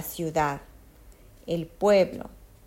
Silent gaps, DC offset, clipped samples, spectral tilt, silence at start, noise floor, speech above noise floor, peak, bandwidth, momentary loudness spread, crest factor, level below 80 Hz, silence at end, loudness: none; under 0.1%; under 0.1%; -5.5 dB/octave; 0 s; -51 dBFS; 26 dB; -10 dBFS; 16 kHz; 21 LU; 18 dB; -52 dBFS; 0.2 s; -26 LUFS